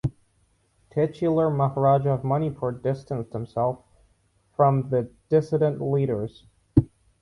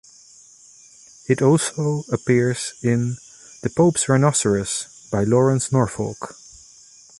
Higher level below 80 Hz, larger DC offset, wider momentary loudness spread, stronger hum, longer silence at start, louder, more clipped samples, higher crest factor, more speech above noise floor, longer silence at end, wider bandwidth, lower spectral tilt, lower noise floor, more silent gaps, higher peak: first, -46 dBFS vs -52 dBFS; neither; about the same, 11 LU vs 12 LU; neither; second, 0.05 s vs 1.3 s; second, -24 LUFS vs -20 LUFS; neither; about the same, 22 dB vs 18 dB; first, 43 dB vs 29 dB; second, 0.35 s vs 0.9 s; about the same, 10.5 kHz vs 11.5 kHz; first, -10 dB/octave vs -5.5 dB/octave; first, -66 dBFS vs -49 dBFS; neither; about the same, -2 dBFS vs -4 dBFS